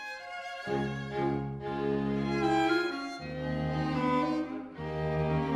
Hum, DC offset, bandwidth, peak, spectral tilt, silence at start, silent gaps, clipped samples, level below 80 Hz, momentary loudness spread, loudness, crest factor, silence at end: none; under 0.1%; 11.5 kHz; -16 dBFS; -7 dB/octave; 0 s; none; under 0.1%; -50 dBFS; 10 LU; -32 LUFS; 16 dB; 0 s